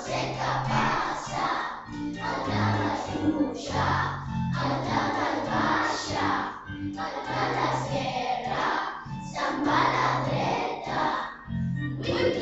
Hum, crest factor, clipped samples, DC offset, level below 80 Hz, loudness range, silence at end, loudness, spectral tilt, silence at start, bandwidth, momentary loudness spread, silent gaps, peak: none; 18 dB; under 0.1%; under 0.1%; -50 dBFS; 1 LU; 0 s; -28 LUFS; -5.5 dB/octave; 0 s; 8.2 kHz; 8 LU; none; -10 dBFS